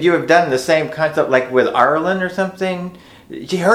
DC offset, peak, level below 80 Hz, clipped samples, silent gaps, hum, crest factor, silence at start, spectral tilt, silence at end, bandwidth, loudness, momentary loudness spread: under 0.1%; 0 dBFS; -56 dBFS; under 0.1%; none; none; 16 dB; 0 s; -5.5 dB/octave; 0 s; 15.5 kHz; -16 LUFS; 12 LU